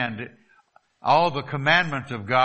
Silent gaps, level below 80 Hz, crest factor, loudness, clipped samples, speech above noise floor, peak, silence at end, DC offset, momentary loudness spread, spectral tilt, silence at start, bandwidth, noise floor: none; -62 dBFS; 20 dB; -22 LUFS; under 0.1%; 38 dB; -4 dBFS; 0 s; under 0.1%; 13 LU; -5.5 dB/octave; 0 s; 8.4 kHz; -60 dBFS